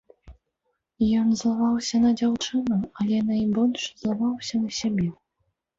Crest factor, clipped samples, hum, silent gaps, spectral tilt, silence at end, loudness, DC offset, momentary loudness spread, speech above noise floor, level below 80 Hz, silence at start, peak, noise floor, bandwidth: 12 dB; under 0.1%; none; none; -5.5 dB/octave; 0.65 s; -24 LUFS; under 0.1%; 6 LU; 54 dB; -54 dBFS; 0.25 s; -12 dBFS; -77 dBFS; 7.8 kHz